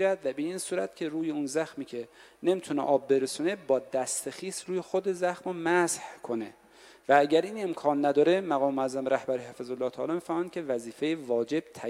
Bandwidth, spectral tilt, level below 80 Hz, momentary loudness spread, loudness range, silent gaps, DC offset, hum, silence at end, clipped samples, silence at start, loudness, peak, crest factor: 15.5 kHz; -4.5 dB/octave; -74 dBFS; 11 LU; 4 LU; none; under 0.1%; none; 0 s; under 0.1%; 0 s; -29 LUFS; -8 dBFS; 20 dB